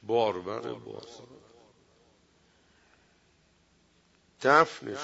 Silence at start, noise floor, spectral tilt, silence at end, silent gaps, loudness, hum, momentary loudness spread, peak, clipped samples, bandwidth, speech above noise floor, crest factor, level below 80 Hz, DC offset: 0.05 s; -66 dBFS; -4.5 dB/octave; 0 s; none; -27 LUFS; none; 24 LU; -6 dBFS; under 0.1%; 8 kHz; 38 dB; 26 dB; -74 dBFS; under 0.1%